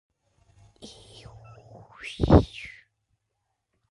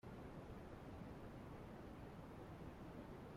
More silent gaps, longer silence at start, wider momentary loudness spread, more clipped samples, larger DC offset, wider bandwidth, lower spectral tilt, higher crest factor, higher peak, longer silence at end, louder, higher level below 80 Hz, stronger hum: neither; first, 2.05 s vs 0.05 s; first, 28 LU vs 1 LU; neither; neither; second, 11.5 kHz vs 16 kHz; about the same, -8 dB/octave vs -7.5 dB/octave; first, 26 dB vs 14 dB; first, -4 dBFS vs -42 dBFS; first, 1.25 s vs 0 s; first, -22 LUFS vs -56 LUFS; first, -36 dBFS vs -64 dBFS; neither